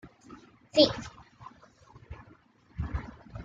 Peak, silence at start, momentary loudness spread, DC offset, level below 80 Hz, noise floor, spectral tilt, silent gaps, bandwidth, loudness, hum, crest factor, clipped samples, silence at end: -6 dBFS; 0.05 s; 28 LU; under 0.1%; -48 dBFS; -59 dBFS; -5.5 dB/octave; none; 7.8 kHz; -28 LUFS; none; 28 dB; under 0.1%; 0 s